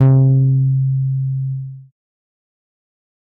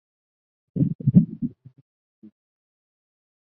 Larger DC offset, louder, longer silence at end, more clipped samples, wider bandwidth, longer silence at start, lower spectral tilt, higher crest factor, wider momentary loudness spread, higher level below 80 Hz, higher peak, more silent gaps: neither; first, -16 LUFS vs -22 LUFS; second, 1.45 s vs 1.95 s; neither; first, 2 kHz vs 1 kHz; second, 0 s vs 0.75 s; second, -13.5 dB/octave vs -15.5 dB/octave; second, 14 dB vs 24 dB; about the same, 14 LU vs 14 LU; about the same, -52 dBFS vs -56 dBFS; about the same, -4 dBFS vs -4 dBFS; second, none vs 0.95-0.99 s